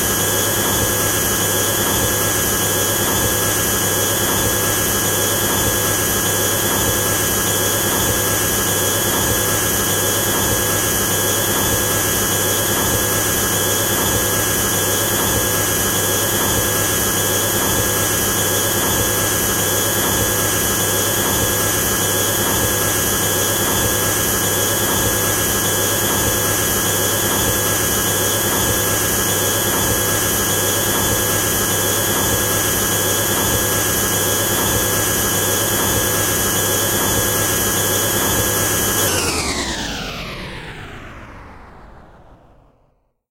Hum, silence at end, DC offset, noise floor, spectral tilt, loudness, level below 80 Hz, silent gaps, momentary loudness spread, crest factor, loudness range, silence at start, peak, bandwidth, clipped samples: none; 0.95 s; under 0.1%; -60 dBFS; -2.5 dB/octave; -15 LUFS; -36 dBFS; none; 0 LU; 14 dB; 0 LU; 0 s; -4 dBFS; 16 kHz; under 0.1%